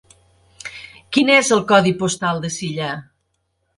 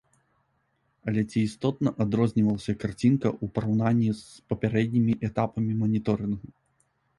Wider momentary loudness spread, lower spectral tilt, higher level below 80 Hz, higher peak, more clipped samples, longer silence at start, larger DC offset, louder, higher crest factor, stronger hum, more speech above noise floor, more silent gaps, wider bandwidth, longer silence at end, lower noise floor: first, 20 LU vs 7 LU; second, -4 dB/octave vs -8 dB/octave; about the same, -58 dBFS vs -54 dBFS; first, 0 dBFS vs -10 dBFS; neither; second, 0.65 s vs 1.05 s; neither; first, -17 LUFS vs -27 LUFS; about the same, 20 dB vs 18 dB; neither; first, 53 dB vs 46 dB; neither; about the same, 11.5 kHz vs 11.5 kHz; about the same, 0.75 s vs 0.7 s; about the same, -70 dBFS vs -72 dBFS